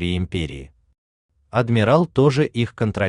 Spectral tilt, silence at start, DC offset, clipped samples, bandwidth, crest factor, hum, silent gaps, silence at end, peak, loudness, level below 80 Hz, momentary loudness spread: -7.5 dB/octave; 0 s; under 0.1%; under 0.1%; 10.5 kHz; 18 dB; none; 0.98-1.29 s; 0 s; -2 dBFS; -20 LUFS; -46 dBFS; 11 LU